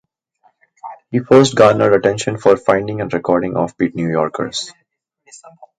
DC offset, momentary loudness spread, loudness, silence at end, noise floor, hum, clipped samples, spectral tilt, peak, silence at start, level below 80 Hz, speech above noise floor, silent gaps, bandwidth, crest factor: under 0.1%; 14 LU; -15 LUFS; 0.15 s; -59 dBFS; none; under 0.1%; -5.5 dB/octave; 0 dBFS; 0.85 s; -52 dBFS; 44 dB; none; 9.8 kHz; 16 dB